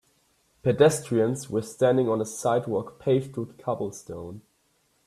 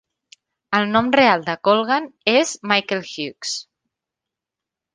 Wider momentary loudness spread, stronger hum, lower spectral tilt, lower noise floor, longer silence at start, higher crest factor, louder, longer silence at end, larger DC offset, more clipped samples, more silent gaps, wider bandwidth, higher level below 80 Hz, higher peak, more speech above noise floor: first, 15 LU vs 12 LU; neither; first, -6 dB/octave vs -3.5 dB/octave; second, -68 dBFS vs -86 dBFS; about the same, 0.65 s vs 0.7 s; about the same, 20 dB vs 20 dB; second, -25 LUFS vs -19 LUFS; second, 0.7 s vs 1.3 s; neither; neither; neither; first, 14 kHz vs 10 kHz; about the same, -62 dBFS vs -62 dBFS; second, -6 dBFS vs -2 dBFS; second, 43 dB vs 67 dB